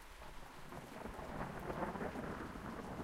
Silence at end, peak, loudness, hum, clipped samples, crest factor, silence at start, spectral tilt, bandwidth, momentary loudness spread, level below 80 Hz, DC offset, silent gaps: 0 s; -28 dBFS; -47 LUFS; none; under 0.1%; 18 dB; 0 s; -6 dB/octave; 16 kHz; 11 LU; -58 dBFS; under 0.1%; none